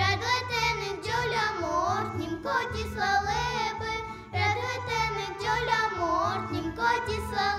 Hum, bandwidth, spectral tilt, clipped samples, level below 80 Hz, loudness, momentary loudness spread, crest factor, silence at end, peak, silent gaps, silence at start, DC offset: none; 15.5 kHz; -4 dB/octave; under 0.1%; -48 dBFS; -28 LUFS; 6 LU; 16 dB; 0 s; -12 dBFS; none; 0 s; under 0.1%